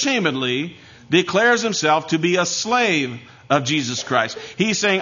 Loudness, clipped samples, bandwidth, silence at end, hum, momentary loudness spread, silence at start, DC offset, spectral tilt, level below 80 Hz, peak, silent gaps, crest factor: -19 LUFS; under 0.1%; 7.4 kHz; 0 s; none; 8 LU; 0 s; under 0.1%; -3.5 dB/octave; -62 dBFS; -2 dBFS; none; 18 dB